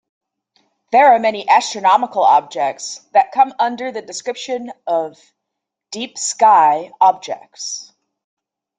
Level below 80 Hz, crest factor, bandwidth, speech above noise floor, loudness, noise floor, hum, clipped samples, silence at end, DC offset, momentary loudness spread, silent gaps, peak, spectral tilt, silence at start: -70 dBFS; 16 dB; 9.4 kHz; 64 dB; -16 LUFS; -80 dBFS; none; under 0.1%; 0.95 s; under 0.1%; 15 LU; none; -2 dBFS; -1.5 dB/octave; 0.9 s